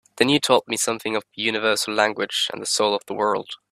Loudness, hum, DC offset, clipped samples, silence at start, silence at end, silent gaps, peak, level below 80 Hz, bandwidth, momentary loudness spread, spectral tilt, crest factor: -21 LUFS; none; under 0.1%; under 0.1%; 0.15 s; 0.15 s; none; 0 dBFS; -64 dBFS; 16 kHz; 5 LU; -2.5 dB/octave; 22 dB